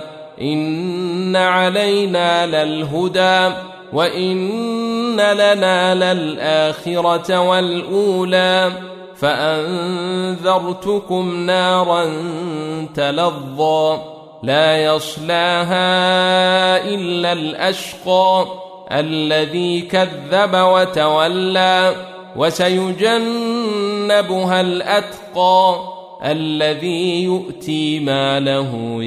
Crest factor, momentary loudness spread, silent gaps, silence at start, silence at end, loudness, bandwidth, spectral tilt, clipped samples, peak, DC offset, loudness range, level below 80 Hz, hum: 14 dB; 9 LU; none; 0 s; 0 s; -16 LUFS; 14.5 kHz; -5 dB/octave; under 0.1%; -2 dBFS; under 0.1%; 3 LU; -58 dBFS; none